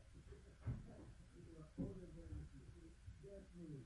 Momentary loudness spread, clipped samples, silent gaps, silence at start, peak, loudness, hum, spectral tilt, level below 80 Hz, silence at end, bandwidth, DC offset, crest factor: 11 LU; under 0.1%; none; 0 s; -36 dBFS; -56 LUFS; none; -8 dB/octave; -62 dBFS; 0 s; 11 kHz; under 0.1%; 20 dB